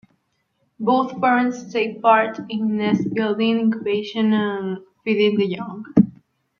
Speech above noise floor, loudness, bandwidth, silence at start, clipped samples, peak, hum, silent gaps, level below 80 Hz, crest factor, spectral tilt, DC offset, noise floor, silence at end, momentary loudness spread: 49 dB; -20 LUFS; 6.8 kHz; 0.8 s; under 0.1%; -2 dBFS; none; none; -62 dBFS; 18 dB; -7 dB/octave; under 0.1%; -69 dBFS; 0.5 s; 7 LU